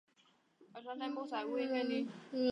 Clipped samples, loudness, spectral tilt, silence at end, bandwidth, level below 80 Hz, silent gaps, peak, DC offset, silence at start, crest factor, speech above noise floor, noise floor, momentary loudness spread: under 0.1%; -39 LUFS; -5.5 dB/octave; 0 s; 9.8 kHz; under -90 dBFS; none; -22 dBFS; under 0.1%; 0.6 s; 18 dB; 34 dB; -72 dBFS; 13 LU